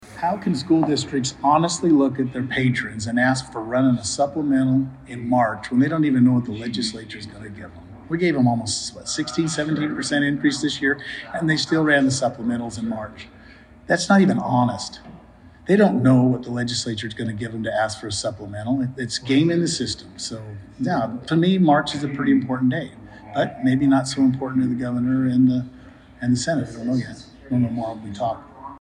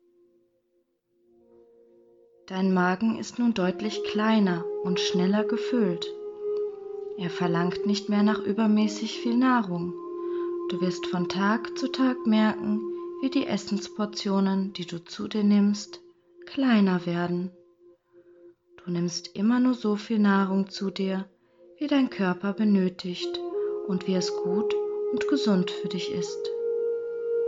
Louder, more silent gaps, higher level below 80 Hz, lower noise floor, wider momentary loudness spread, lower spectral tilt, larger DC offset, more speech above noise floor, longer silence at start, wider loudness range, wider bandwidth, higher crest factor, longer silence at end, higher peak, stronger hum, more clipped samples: first, -21 LUFS vs -27 LUFS; neither; first, -54 dBFS vs -70 dBFS; second, -47 dBFS vs -72 dBFS; first, 13 LU vs 10 LU; about the same, -5.5 dB/octave vs -6 dB/octave; neither; second, 26 dB vs 47 dB; second, 0 s vs 2.45 s; about the same, 3 LU vs 3 LU; first, 10.5 kHz vs 7.8 kHz; about the same, 18 dB vs 16 dB; about the same, 0.05 s vs 0 s; first, -4 dBFS vs -12 dBFS; neither; neither